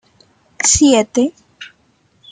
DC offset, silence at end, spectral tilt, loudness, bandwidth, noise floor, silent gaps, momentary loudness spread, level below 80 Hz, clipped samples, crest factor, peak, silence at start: under 0.1%; 0.65 s; -2.5 dB/octave; -13 LUFS; 9.6 kHz; -57 dBFS; none; 8 LU; -40 dBFS; under 0.1%; 16 dB; -2 dBFS; 0.6 s